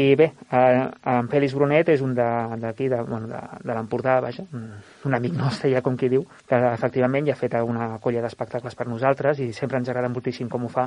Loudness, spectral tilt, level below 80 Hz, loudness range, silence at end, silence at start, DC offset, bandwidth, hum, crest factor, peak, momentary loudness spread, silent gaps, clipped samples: -23 LUFS; -8 dB/octave; -62 dBFS; 4 LU; 0 s; 0 s; under 0.1%; 10.5 kHz; none; 18 dB; -4 dBFS; 11 LU; none; under 0.1%